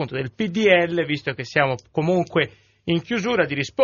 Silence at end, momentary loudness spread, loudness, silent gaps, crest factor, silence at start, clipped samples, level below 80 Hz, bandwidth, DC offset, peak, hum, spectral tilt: 0 s; 9 LU; -22 LUFS; none; 20 dB; 0 s; under 0.1%; -58 dBFS; 7.2 kHz; under 0.1%; -2 dBFS; none; -4 dB/octave